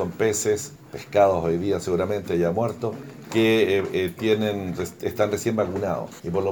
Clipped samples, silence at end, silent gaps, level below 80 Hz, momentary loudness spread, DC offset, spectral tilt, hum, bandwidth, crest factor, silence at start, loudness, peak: under 0.1%; 0 s; none; -54 dBFS; 10 LU; under 0.1%; -5 dB/octave; none; over 20 kHz; 16 dB; 0 s; -24 LUFS; -6 dBFS